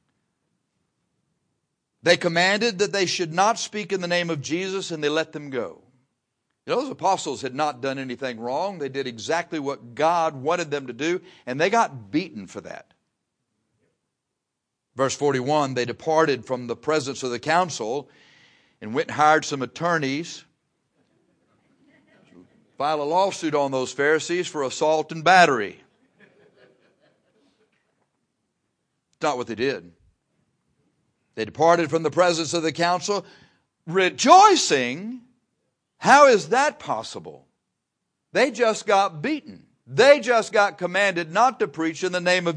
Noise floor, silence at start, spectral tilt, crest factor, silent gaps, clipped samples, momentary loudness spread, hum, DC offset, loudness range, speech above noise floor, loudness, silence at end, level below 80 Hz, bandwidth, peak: -82 dBFS; 2.05 s; -3.5 dB/octave; 24 dB; none; under 0.1%; 14 LU; none; under 0.1%; 11 LU; 60 dB; -22 LUFS; 0 s; -72 dBFS; 10.5 kHz; 0 dBFS